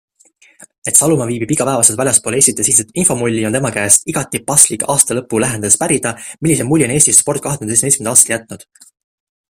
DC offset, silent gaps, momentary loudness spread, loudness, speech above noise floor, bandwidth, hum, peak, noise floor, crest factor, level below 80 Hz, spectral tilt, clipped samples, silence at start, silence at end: under 0.1%; none; 8 LU; -12 LUFS; 36 dB; over 20 kHz; none; 0 dBFS; -50 dBFS; 14 dB; -48 dBFS; -3.5 dB/octave; 0.3%; 0.85 s; 0.95 s